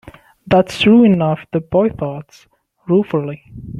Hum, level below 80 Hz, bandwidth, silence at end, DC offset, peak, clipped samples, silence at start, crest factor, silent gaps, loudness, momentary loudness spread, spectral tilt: none; -46 dBFS; 11.5 kHz; 0 s; under 0.1%; -2 dBFS; under 0.1%; 0.05 s; 14 dB; none; -15 LUFS; 19 LU; -7.5 dB/octave